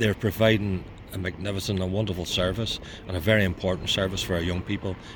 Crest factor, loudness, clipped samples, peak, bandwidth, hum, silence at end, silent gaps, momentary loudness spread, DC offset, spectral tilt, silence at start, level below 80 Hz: 20 dB; -26 LUFS; under 0.1%; -6 dBFS; 19 kHz; none; 0 s; none; 11 LU; under 0.1%; -5 dB/octave; 0 s; -44 dBFS